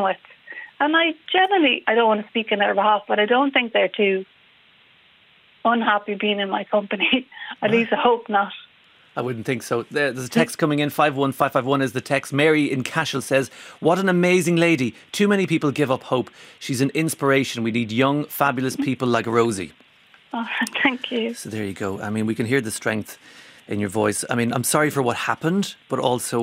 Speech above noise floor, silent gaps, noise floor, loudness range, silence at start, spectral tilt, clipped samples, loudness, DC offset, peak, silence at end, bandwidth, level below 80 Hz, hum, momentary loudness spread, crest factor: 34 dB; none; -55 dBFS; 5 LU; 0 s; -4.5 dB/octave; under 0.1%; -21 LUFS; under 0.1%; -2 dBFS; 0 s; 16 kHz; -66 dBFS; none; 10 LU; 20 dB